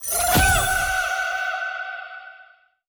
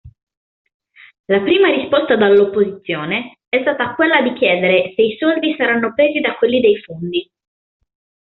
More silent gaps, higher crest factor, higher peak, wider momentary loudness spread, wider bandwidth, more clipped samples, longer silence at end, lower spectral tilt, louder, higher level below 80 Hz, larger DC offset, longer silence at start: second, none vs 0.23-0.27 s, 0.37-0.65 s, 0.74-0.80 s, 1.19-1.24 s; about the same, 16 dB vs 14 dB; second, -6 dBFS vs -2 dBFS; first, 18 LU vs 9 LU; first, over 20 kHz vs 4.3 kHz; neither; second, 0.45 s vs 1 s; about the same, -2 dB/octave vs -2.5 dB/octave; second, -21 LUFS vs -15 LUFS; first, -34 dBFS vs -58 dBFS; neither; about the same, 0 s vs 0.05 s